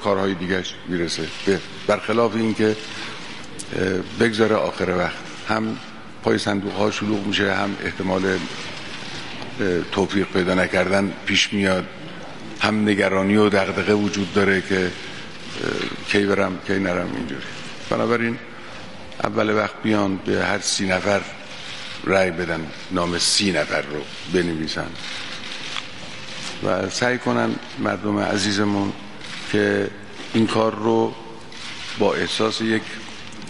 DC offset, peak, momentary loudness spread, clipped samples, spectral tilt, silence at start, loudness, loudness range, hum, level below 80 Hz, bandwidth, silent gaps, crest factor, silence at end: 1%; 0 dBFS; 14 LU; under 0.1%; -4.5 dB/octave; 0 s; -22 LUFS; 4 LU; none; -54 dBFS; 11.5 kHz; none; 22 dB; 0 s